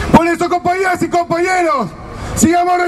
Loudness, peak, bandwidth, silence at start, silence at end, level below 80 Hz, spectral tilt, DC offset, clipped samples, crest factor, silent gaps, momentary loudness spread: -14 LUFS; 0 dBFS; 13.5 kHz; 0 s; 0 s; -34 dBFS; -5 dB/octave; under 0.1%; 0.3%; 14 dB; none; 10 LU